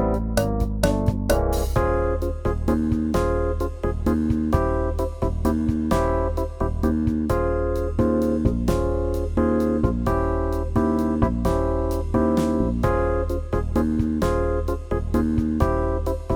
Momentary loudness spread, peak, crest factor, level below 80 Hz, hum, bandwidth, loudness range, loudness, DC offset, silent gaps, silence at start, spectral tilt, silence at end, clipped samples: 4 LU; -4 dBFS; 16 dB; -28 dBFS; none; 19 kHz; 1 LU; -23 LUFS; under 0.1%; none; 0 s; -7.5 dB/octave; 0 s; under 0.1%